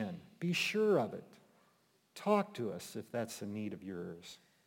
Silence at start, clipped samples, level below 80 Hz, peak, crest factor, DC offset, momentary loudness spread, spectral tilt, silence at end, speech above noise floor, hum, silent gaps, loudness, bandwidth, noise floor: 0 s; under 0.1%; -82 dBFS; -18 dBFS; 20 dB; under 0.1%; 17 LU; -5 dB/octave; 0.3 s; 36 dB; none; none; -37 LUFS; 17 kHz; -73 dBFS